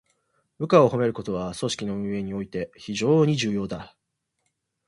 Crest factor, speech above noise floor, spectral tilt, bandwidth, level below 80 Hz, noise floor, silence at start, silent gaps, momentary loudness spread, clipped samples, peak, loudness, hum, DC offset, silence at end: 22 dB; 53 dB; -6 dB/octave; 11.5 kHz; -56 dBFS; -77 dBFS; 0.6 s; none; 14 LU; under 0.1%; -4 dBFS; -24 LUFS; none; under 0.1%; 1 s